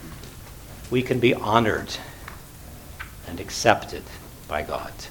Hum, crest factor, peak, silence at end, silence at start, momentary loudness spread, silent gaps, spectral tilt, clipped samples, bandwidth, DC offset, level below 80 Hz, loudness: none; 26 dB; 0 dBFS; 0 s; 0 s; 21 LU; none; -4.5 dB/octave; under 0.1%; 19 kHz; under 0.1%; -44 dBFS; -24 LUFS